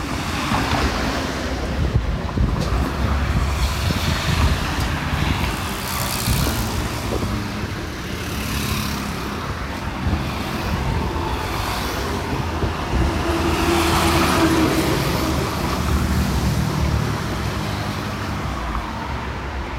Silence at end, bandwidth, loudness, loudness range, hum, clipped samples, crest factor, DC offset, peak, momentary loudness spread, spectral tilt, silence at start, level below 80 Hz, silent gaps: 0 s; 16 kHz; -22 LUFS; 5 LU; none; under 0.1%; 14 dB; under 0.1%; -6 dBFS; 8 LU; -5 dB/octave; 0 s; -28 dBFS; none